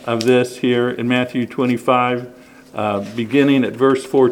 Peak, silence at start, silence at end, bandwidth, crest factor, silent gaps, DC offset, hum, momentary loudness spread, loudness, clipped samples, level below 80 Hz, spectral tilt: 0 dBFS; 0 s; 0 s; 15.5 kHz; 16 dB; none; under 0.1%; none; 8 LU; -17 LUFS; under 0.1%; -62 dBFS; -6 dB/octave